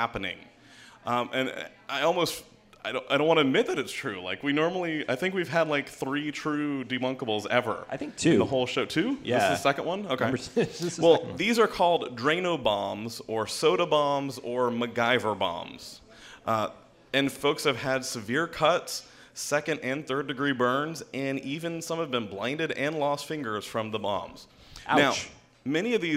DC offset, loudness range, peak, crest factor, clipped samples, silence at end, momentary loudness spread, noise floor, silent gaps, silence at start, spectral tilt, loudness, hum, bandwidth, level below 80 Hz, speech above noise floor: under 0.1%; 4 LU; -6 dBFS; 22 dB; under 0.1%; 0 s; 11 LU; -53 dBFS; none; 0 s; -4.5 dB/octave; -28 LUFS; none; 16 kHz; -62 dBFS; 25 dB